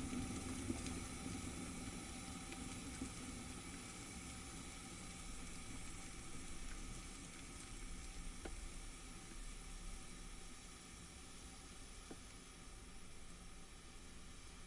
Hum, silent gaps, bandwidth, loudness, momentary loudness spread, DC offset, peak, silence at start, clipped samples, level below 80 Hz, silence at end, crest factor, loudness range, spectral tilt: none; none; 11.5 kHz; -51 LUFS; 11 LU; under 0.1%; -28 dBFS; 0 s; under 0.1%; -56 dBFS; 0 s; 22 dB; 8 LU; -3.5 dB/octave